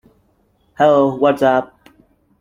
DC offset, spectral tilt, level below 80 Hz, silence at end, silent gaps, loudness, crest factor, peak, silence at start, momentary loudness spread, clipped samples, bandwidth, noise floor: under 0.1%; -7 dB/octave; -58 dBFS; 0.75 s; none; -15 LUFS; 16 dB; -2 dBFS; 0.8 s; 7 LU; under 0.1%; 14 kHz; -59 dBFS